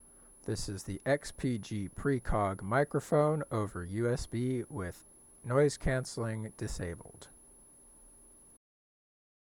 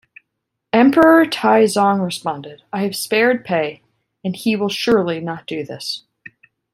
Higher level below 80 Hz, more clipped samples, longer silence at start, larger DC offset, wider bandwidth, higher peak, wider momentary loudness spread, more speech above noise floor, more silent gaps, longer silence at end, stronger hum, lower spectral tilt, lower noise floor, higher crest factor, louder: first, -50 dBFS vs -58 dBFS; neither; second, 0.45 s vs 0.75 s; neither; first, 17.5 kHz vs 15.5 kHz; second, -16 dBFS vs -2 dBFS; about the same, 14 LU vs 15 LU; second, 25 dB vs 60 dB; neither; first, 1.45 s vs 0.75 s; neither; about the same, -6 dB/octave vs -5 dB/octave; second, -58 dBFS vs -77 dBFS; about the same, 18 dB vs 16 dB; second, -34 LUFS vs -17 LUFS